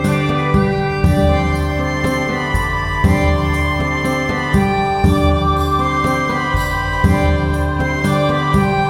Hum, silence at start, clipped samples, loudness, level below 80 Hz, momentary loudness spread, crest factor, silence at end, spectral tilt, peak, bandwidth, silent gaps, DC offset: none; 0 s; under 0.1%; -16 LUFS; -26 dBFS; 4 LU; 14 dB; 0 s; -6.5 dB/octave; -2 dBFS; 16.5 kHz; none; 0.2%